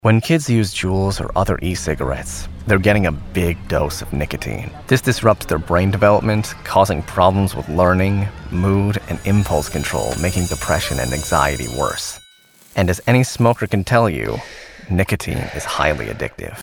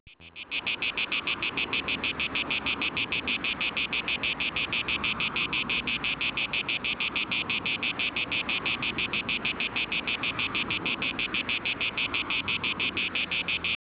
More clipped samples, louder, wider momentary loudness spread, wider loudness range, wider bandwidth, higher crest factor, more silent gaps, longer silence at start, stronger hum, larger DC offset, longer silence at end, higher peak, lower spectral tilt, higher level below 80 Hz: neither; first, -18 LUFS vs -27 LUFS; first, 10 LU vs 2 LU; about the same, 3 LU vs 1 LU; first, over 20 kHz vs 4 kHz; about the same, 18 dB vs 16 dB; neither; about the same, 0.05 s vs 0.05 s; neither; neither; second, 0 s vs 0.25 s; first, 0 dBFS vs -14 dBFS; first, -5.5 dB/octave vs 0 dB/octave; first, -32 dBFS vs -54 dBFS